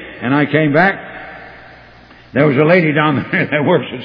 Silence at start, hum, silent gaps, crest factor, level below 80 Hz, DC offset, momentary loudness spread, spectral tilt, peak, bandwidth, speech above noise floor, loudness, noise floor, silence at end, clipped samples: 0 s; none; none; 16 dB; -52 dBFS; under 0.1%; 19 LU; -9.5 dB/octave; 0 dBFS; 5.2 kHz; 28 dB; -13 LUFS; -41 dBFS; 0 s; under 0.1%